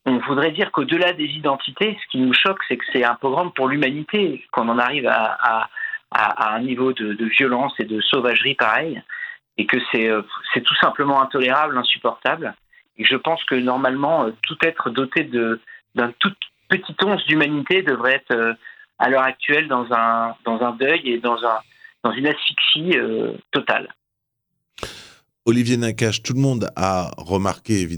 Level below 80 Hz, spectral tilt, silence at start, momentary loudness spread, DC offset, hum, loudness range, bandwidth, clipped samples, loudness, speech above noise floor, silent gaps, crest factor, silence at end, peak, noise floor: -62 dBFS; -4.5 dB/octave; 0.05 s; 7 LU; under 0.1%; none; 3 LU; 19.5 kHz; under 0.1%; -19 LUFS; 59 dB; none; 20 dB; 0 s; 0 dBFS; -78 dBFS